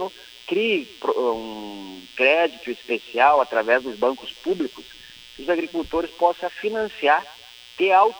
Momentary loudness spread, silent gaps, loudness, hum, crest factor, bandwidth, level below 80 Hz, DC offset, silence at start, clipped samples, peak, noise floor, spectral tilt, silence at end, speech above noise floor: 20 LU; none; -22 LUFS; none; 18 dB; over 20 kHz; -56 dBFS; under 0.1%; 0 s; under 0.1%; -4 dBFS; -44 dBFS; -4 dB/octave; 0 s; 23 dB